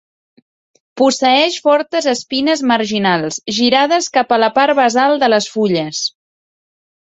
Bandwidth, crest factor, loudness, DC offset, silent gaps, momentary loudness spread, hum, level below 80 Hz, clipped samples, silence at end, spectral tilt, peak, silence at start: 8.2 kHz; 16 dB; -14 LUFS; under 0.1%; none; 5 LU; none; -60 dBFS; under 0.1%; 1.1 s; -3.5 dB/octave; 0 dBFS; 0.95 s